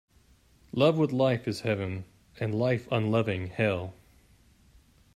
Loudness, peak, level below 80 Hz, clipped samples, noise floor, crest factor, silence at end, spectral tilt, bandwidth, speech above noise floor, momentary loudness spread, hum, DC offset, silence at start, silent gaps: -28 LUFS; -10 dBFS; -62 dBFS; under 0.1%; -61 dBFS; 20 dB; 1.25 s; -7.5 dB/octave; 13.5 kHz; 34 dB; 11 LU; none; under 0.1%; 0.75 s; none